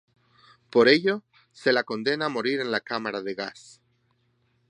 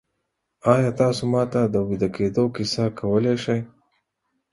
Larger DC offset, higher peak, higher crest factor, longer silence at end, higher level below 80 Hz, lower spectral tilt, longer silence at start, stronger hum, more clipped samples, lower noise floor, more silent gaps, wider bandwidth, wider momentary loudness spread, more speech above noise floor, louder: neither; about the same, -4 dBFS vs -2 dBFS; about the same, 22 dB vs 22 dB; first, 1.15 s vs 0.85 s; second, -72 dBFS vs -52 dBFS; second, -5 dB/octave vs -6.5 dB/octave; about the same, 0.75 s vs 0.65 s; neither; neither; second, -69 dBFS vs -77 dBFS; neither; second, 10 kHz vs 11.5 kHz; first, 14 LU vs 6 LU; second, 44 dB vs 56 dB; second, -25 LUFS vs -22 LUFS